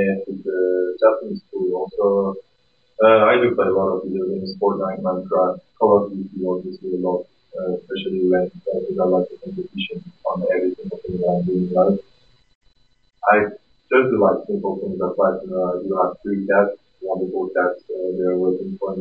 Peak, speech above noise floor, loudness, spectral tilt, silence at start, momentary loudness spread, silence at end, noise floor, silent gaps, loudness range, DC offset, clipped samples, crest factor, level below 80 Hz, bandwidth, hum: -2 dBFS; 43 dB; -20 LUFS; -10 dB/octave; 0 s; 11 LU; 0 s; -63 dBFS; 12.55-12.61 s; 4 LU; under 0.1%; under 0.1%; 18 dB; -58 dBFS; 5.2 kHz; none